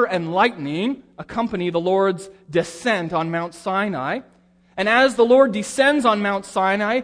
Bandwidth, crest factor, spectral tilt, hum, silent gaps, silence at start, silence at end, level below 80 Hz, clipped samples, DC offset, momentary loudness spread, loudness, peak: 11 kHz; 16 dB; -5 dB/octave; none; none; 0 s; 0 s; -58 dBFS; under 0.1%; under 0.1%; 11 LU; -20 LUFS; -4 dBFS